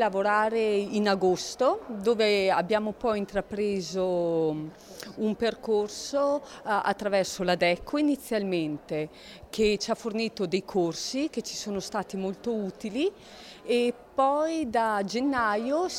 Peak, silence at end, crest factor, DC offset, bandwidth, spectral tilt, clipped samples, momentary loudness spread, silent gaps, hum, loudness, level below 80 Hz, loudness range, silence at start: -10 dBFS; 0 s; 16 dB; under 0.1%; 16 kHz; -4.5 dB/octave; under 0.1%; 8 LU; none; none; -28 LUFS; -58 dBFS; 4 LU; 0 s